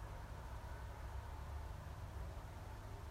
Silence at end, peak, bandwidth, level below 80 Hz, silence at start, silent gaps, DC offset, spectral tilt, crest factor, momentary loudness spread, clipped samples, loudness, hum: 0 s; -38 dBFS; 16 kHz; -52 dBFS; 0 s; none; under 0.1%; -6 dB/octave; 12 dB; 2 LU; under 0.1%; -51 LUFS; none